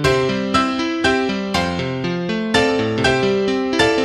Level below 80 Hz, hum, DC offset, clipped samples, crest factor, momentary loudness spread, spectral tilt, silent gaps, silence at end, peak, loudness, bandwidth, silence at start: -40 dBFS; none; under 0.1%; under 0.1%; 18 dB; 5 LU; -5 dB/octave; none; 0 s; 0 dBFS; -18 LUFS; 13 kHz; 0 s